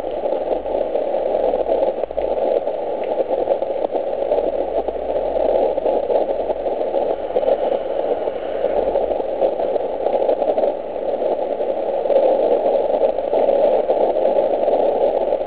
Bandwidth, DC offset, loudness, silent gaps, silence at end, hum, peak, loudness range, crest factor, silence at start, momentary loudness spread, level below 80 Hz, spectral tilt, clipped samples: 4 kHz; 1%; -19 LUFS; none; 0 s; none; -4 dBFS; 3 LU; 14 dB; 0 s; 5 LU; -48 dBFS; -9 dB/octave; under 0.1%